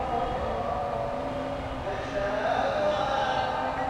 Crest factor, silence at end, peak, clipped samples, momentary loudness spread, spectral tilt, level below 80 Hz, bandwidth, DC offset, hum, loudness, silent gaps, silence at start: 14 dB; 0 s; -14 dBFS; under 0.1%; 6 LU; -5.5 dB/octave; -44 dBFS; 11.5 kHz; under 0.1%; none; -29 LUFS; none; 0 s